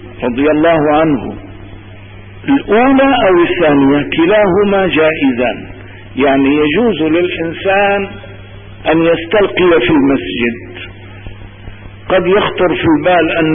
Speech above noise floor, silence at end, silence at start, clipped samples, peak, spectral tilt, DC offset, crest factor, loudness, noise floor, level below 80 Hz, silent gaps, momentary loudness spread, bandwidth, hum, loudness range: 22 dB; 0 s; 0 s; under 0.1%; -2 dBFS; -12 dB/octave; under 0.1%; 10 dB; -11 LUFS; -32 dBFS; -36 dBFS; none; 19 LU; 3.7 kHz; none; 4 LU